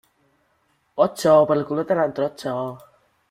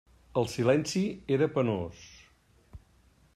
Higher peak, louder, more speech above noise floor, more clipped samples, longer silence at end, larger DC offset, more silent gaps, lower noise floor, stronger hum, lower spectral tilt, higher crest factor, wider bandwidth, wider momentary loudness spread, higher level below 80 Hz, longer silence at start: first, -4 dBFS vs -12 dBFS; first, -20 LUFS vs -29 LUFS; first, 46 dB vs 35 dB; neither; about the same, 0.55 s vs 0.6 s; neither; neither; about the same, -66 dBFS vs -63 dBFS; neither; about the same, -6 dB/octave vs -6 dB/octave; about the same, 18 dB vs 20 dB; about the same, 15 kHz vs 15 kHz; first, 13 LU vs 10 LU; about the same, -64 dBFS vs -60 dBFS; first, 0.95 s vs 0.35 s